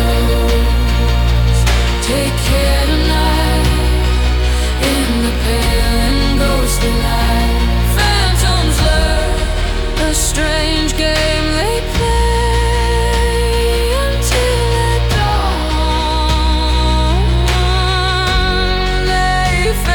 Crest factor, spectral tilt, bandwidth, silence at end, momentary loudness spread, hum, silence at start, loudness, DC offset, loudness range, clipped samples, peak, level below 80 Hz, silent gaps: 10 dB; -4.5 dB/octave; 18 kHz; 0 s; 2 LU; none; 0 s; -14 LUFS; under 0.1%; 1 LU; under 0.1%; -2 dBFS; -16 dBFS; none